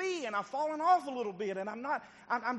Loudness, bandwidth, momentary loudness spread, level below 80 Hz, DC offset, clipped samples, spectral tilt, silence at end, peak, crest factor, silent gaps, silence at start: -34 LUFS; 9.4 kHz; 9 LU; -80 dBFS; under 0.1%; under 0.1%; -4 dB/octave; 0 s; -16 dBFS; 18 dB; none; 0 s